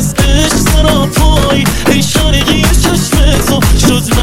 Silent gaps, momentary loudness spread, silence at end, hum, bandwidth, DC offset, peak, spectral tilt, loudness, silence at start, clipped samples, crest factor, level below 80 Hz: none; 1 LU; 0 s; none; 16.5 kHz; 6%; 0 dBFS; -4.5 dB/octave; -9 LUFS; 0 s; 0.3%; 8 dB; -12 dBFS